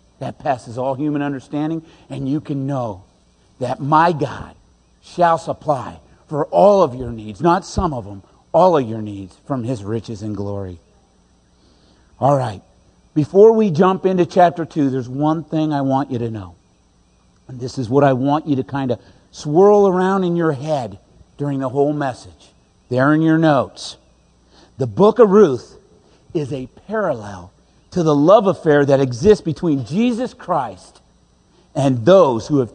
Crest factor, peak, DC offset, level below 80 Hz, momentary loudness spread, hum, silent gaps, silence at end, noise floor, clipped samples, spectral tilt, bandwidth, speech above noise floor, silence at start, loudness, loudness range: 18 dB; 0 dBFS; under 0.1%; -46 dBFS; 17 LU; none; none; 0.05 s; -55 dBFS; under 0.1%; -7.5 dB/octave; 9.8 kHz; 39 dB; 0.2 s; -17 LUFS; 6 LU